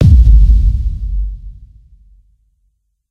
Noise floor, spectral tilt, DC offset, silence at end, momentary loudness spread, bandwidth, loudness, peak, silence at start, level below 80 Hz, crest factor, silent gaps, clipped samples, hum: -62 dBFS; -9.5 dB/octave; under 0.1%; 1.6 s; 17 LU; 0.8 kHz; -12 LUFS; 0 dBFS; 0 s; -12 dBFS; 12 dB; none; 0.4%; none